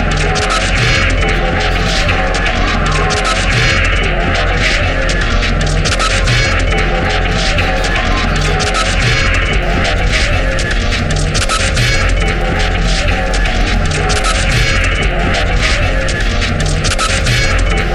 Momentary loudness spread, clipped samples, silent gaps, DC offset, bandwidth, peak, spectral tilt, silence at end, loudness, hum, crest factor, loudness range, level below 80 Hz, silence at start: 3 LU; under 0.1%; none; under 0.1%; 12 kHz; 0 dBFS; -4 dB/octave; 0 s; -13 LUFS; none; 12 dB; 1 LU; -16 dBFS; 0 s